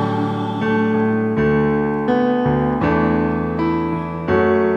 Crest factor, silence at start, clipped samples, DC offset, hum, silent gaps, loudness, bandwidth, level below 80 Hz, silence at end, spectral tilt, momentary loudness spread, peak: 12 dB; 0 s; under 0.1%; under 0.1%; none; none; -18 LUFS; 6.6 kHz; -42 dBFS; 0 s; -9 dB/octave; 4 LU; -4 dBFS